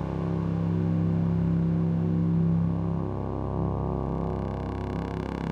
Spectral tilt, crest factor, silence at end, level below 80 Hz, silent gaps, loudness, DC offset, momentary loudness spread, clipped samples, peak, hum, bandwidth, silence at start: -10.5 dB/octave; 10 dB; 0 s; -40 dBFS; none; -28 LUFS; under 0.1%; 7 LU; under 0.1%; -16 dBFS; none; 4.9 kHz; 0 s